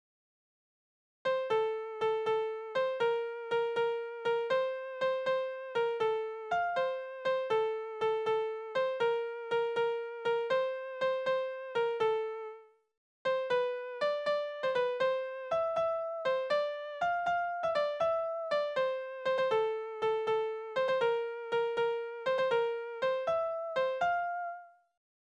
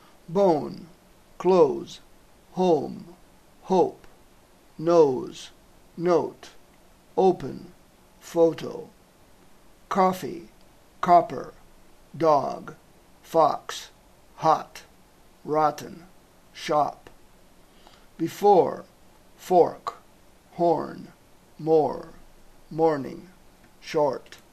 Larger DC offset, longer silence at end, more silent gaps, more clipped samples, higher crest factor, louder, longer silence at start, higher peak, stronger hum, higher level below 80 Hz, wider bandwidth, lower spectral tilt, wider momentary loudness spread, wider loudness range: neither; first, 0.55 s vs 0.15 s; first, 12.97-13.25 s vs none; neither; second, 14 dB vs 20 dB; second, -33 LUFS vs -24 LUFS; first, 1.25 s vs 0.3 s; second, -20 dBFS vs -6 dBFS; neither; second, -76 dBFS vs -58 dBFS; second, 8.2 kHz vs 14 kHz; second, -3.5 dB/octave vs -6.5 dB/octave; second, 5 LU vs 23 LU; about the same, 2 LU vs 4 LU